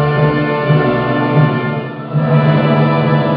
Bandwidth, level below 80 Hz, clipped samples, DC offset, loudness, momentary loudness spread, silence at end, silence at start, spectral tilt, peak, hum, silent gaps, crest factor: 5 kHz; -44 dBFS; under 0.1%; under 0.1%; -13 LUFS; 6 LU; 0 s; 0 s; -11 dB/octave; 0 dBFS; none; none; 12 dB